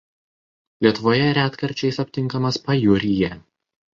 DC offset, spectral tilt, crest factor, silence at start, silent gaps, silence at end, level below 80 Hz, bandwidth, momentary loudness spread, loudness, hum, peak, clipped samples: under 0.1%; -6.5 dB/octave; 20 dB; 0.8 s; none; 0.55 s; -50 dBFS; 7.6 kHz; 6 LU; -20 LUFS; none; -2 dBFS; under 0.1%